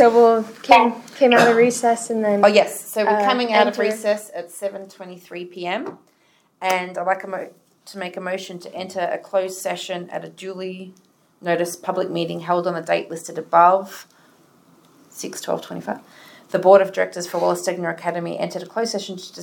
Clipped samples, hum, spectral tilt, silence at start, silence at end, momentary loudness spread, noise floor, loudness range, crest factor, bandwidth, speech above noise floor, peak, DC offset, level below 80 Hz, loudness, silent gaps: under 0.1%; none; -4 dB/octave; 0 s; 0 s; 18 LU; -54 dBFS; 10 LU; 20 dB; 18 kHz; 35 dB; 0 dBFS; under 0.1%; -70 dBFS; -20 LUFS; none